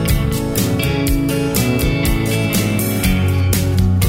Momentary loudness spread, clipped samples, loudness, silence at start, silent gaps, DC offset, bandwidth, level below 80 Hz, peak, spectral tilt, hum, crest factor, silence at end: 2 LU; under 0.1%; -16 LUFS; 0 s; none; under 0.1%; 16.5 kHz; -24 dBFS; -2 dBFS; -5.5 dB/octave; none; 14 dB; 0 s